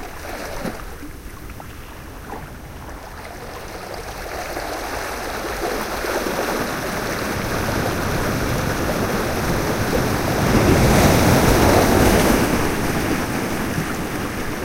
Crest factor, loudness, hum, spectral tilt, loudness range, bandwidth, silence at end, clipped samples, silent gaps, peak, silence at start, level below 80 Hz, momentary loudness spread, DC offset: 18 dB; -20 LUFS; none; -5 dB/octave; 17 LU; 16 kHz; 0 s; under 0.1%; none; -2 dBFS; 0 s; -30 dBFS; 21 LU; under 0.1%